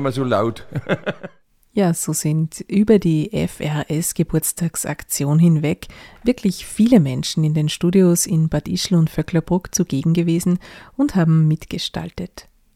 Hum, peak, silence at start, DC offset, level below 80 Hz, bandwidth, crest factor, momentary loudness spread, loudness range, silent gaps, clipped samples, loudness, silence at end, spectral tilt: none; 0 dBFS; 0 s; under 0.1%; -44 dBFS; 16 kHz; 18 dB; 11 LU; 3 LU; none; under 0.1%; -19 LUFS; 0.35 s; -6 dB/octave